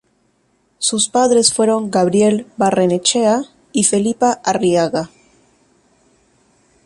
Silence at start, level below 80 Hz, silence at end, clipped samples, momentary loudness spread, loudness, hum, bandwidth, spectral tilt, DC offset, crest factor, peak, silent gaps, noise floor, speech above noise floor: 0.8 s; -58 dBFS; 1.8 s; under 0.1%; 8 LU; -15 LUFS; none; 11.5 kHz; -3.5 dB/octave; under 0.1%; 18 dB; 0 dBFS; none; -61 dBFS; 46 dB